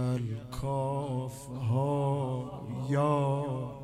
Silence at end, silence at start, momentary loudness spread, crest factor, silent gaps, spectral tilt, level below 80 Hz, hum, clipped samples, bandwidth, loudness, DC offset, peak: 0 s; 0 s; 9 LU; 16 dB; none; -8 dB/octave; -54 dBFS; none; under 0.1%; 13 kHz; -32 LUFS; under 0.1%; -16 dBFS